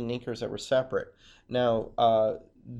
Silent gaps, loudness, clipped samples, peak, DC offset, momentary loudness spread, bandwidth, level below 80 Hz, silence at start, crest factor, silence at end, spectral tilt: none; -28 LUFS; under 0.1%; -12 dBFS; under 0.1%; 11 LU; 11 kHz; -56 dBFS; 0 s; 16 dB; 0 s; -6 dB/octave